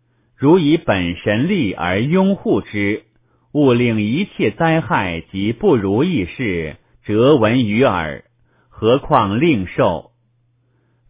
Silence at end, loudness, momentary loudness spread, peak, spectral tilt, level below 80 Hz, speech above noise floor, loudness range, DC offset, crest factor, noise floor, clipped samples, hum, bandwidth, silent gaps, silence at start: 1.1 s; -17 LUFS; 9 LU; 0 dBFS; -11 dB/octave; -42 dBFS; 45 dB; 2 LU; under 0.1%; 16 dB; -61 dBFS; under 0.1%; none; 4 kHz; none; 0.4 s